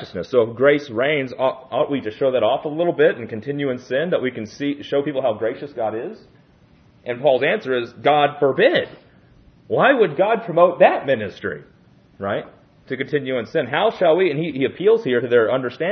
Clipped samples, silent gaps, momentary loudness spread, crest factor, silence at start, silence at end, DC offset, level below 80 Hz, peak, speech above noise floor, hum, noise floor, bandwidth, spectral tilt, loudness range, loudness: under 0.1%; none; 11 LU; 20 dB; 0 s; 0 s; under 0.1%; -64 dBFS; 0 dBFS; 33 dB; none; -52 dBFS; 6.6 kHz; -7 dB/octave; 6 LU; -19 LUFS